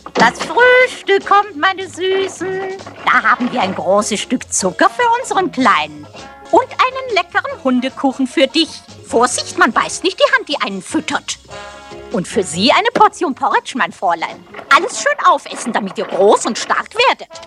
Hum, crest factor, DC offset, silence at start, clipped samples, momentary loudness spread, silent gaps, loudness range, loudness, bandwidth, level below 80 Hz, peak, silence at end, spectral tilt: none; 16 dB; under 0.1%; 0.05 s; under 0.1%; 10 LU; none; 2 LU; -15 LUFS; 13 kHz; -54 dBFS; 0 dBFS; 0 s; -3 dB/octave